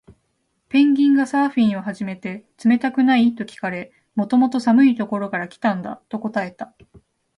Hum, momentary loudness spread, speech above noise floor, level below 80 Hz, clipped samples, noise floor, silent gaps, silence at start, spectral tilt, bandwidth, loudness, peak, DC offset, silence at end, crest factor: none; 15 LU; 51 dB; -64 dBFS; under 0.1%; -70 dBFS; none; 0.75 s; -6.5 dB/octave; 10.5 kHz; -19 LUFS; -6 dBFS; under 0.1%; 0.7 s; 14 dB